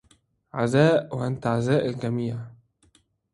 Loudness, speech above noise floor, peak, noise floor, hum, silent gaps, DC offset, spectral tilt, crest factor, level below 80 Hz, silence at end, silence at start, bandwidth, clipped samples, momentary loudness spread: -24 LUFS; 40 dB; -4 dBFS; -63 dBFS; none; none; under 0.1%; -7 dB/octave; 20 dB; -60 dBFS; 0.85 s; 0.55 s; 11.5 kHz; under 0.1%; 16 LU